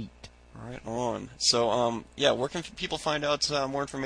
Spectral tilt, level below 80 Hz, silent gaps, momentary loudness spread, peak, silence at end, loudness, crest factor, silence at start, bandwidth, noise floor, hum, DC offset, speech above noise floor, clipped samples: -3 dB/octave; -54 dBFS; none; 15 LU; -10 dBFS; 0 s; -28 LUFS; 20 dB; 0 s; 10.5 kHz; -50 dBFS; none; under 0.1%; 21 dB; under 0.1%